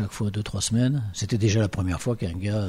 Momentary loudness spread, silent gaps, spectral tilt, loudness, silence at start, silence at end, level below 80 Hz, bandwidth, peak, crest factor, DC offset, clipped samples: 5 LU; none; -5.5 dB/octave; -25 LUFS; 0 s; 0 s; -44 dBFS; 13 kHz; -12 dBFS; 14 dB; under 0.1%; under 0.1%